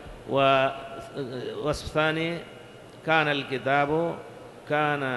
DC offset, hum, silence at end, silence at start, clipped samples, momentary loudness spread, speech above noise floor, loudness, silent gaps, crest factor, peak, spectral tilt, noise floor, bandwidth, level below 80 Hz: under 0.1%; none; 0 s; 0 s; under 0.1%; 18 LU; 20 dB; -26 LUFS; none; 18 dB; -8 dBFS; -5.5 dB/octave; -46 dBFS; 12.5 kHz; -52 dBFS